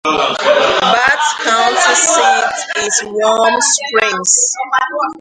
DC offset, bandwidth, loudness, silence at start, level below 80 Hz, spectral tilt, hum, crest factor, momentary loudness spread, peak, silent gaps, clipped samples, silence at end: under 0.1%; 11 kHz; -12 LUFS; 0.05 s; -54 dBFS; 0 dB/octave; none; 12 dB; 5 LU; 0 dBFS; none; under 0.1%; 0 s